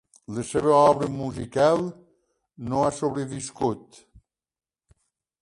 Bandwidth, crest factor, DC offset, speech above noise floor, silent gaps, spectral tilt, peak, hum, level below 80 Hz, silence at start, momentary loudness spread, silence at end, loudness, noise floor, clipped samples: 11.5 kHz; 20 dB; under 0.1%; over 67 dB; none; -6 dB/octave; -6 dBFS; none; -56 dBFS; 0.3 s; 16 LU; 1.6 s; -24 LUFS; under -90 dBFS; under 0.1%